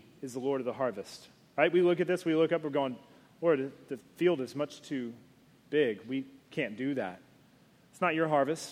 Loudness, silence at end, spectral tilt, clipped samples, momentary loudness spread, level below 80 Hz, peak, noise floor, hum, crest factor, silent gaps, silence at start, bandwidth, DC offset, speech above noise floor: -31 LUFS; 0 s; -6 dB/octave; under 0.1%; 14 LU; -78 dBFS; -12 dBFS; -62 dBFS; none; 20 dB; none; 0.2 s; 14 kHz; under 0.1%; 31 dB